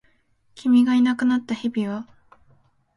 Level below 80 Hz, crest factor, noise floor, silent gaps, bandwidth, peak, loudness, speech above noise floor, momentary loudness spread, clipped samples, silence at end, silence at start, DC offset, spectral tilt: -64 dBFS; 14 dB; -62 dBFS; none; 11 kHz; -8 dBFS; -21 LUFS; 42 dB; 12 LU; under 0.1%; 0.95 s; 0.55 s; under 0.1%; -6 dB/octave